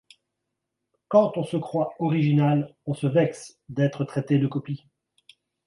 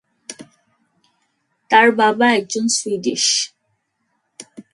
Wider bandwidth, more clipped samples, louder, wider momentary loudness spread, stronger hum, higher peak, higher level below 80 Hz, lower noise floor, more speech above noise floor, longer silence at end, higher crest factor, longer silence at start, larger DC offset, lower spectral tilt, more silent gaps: about the same, 11.5 kHz vs 11.5 kHz; neither; second, -24 LUFS vs -16 LUFS; second, 12 LU vs 24 LU; neither; second, -6 dBFS vs 0 dBFS; about the same, -68 dBFS vs -70 dBFS; first, -82 dBFS vs -70 dBFS; first, 58 dB vs 53 dB; first, 0.9 s vs 0.1 s; about the same, 20 dB vs 20 dB; first, 1.1 s vs 0.3 s; neither; first, -8 dB/octave vs -1.5 dB/octave; neither